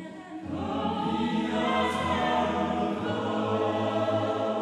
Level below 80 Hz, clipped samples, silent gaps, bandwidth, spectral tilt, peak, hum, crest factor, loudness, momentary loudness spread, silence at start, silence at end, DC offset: -54 dBFS; under 0.1%; none; 12 kHz; -6 dB/octave; -14 dBFS; none; 14 dB; -28 LUFS; 6 LU; 0 s; 0 s; under 0.1%